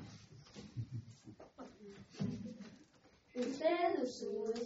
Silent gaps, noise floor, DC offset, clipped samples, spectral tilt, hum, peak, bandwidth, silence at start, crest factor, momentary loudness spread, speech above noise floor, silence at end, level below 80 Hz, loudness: none; -68 dBFS; under 0.1%; under 0.1%; -5.5 dB/octave; none; -24 dBFS; 7.6 kHz; 0 s; 18 dB; 21 LU; 30 dB; 0 s; -72 dBFS; -40 LUFS